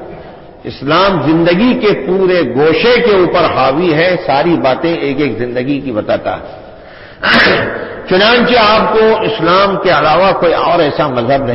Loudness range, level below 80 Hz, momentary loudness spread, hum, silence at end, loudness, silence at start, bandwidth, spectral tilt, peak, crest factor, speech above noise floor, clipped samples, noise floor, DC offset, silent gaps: 4 LU; -38 dBFS; 9 LU; none; 0 s; -10 LUFS; 0 s; 5.8 kHz; -8 dB/octave; 0 dBFS; 10 dB; 23 dB; under 0.1%; -33 dBFS; under 0.1%; none